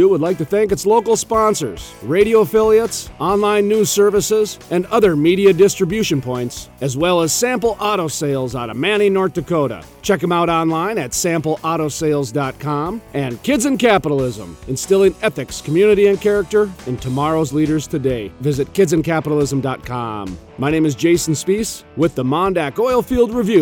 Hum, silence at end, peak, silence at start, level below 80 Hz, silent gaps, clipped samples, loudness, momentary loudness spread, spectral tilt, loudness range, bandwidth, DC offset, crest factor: none; 0 s; -2 dBFS; 0 s; -42 dBFS; none; under 0.1%; -17 LUFS; 10 LU; -5 dB/octave; 4 LU; 17.5 kHz; under 0.1%; 14 dB